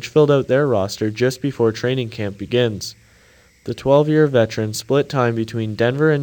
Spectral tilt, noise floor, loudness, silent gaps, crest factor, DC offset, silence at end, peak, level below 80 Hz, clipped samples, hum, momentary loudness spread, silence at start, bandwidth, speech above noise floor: -6 dB/octave; -52 dBFS; -18 LUFS; none; 16 dB; under 0.1%; 0 s; -2 dBFS; -54 dBFS; under 0.1%; none; 11 LU; 0 s; 19 kHz; 34 dB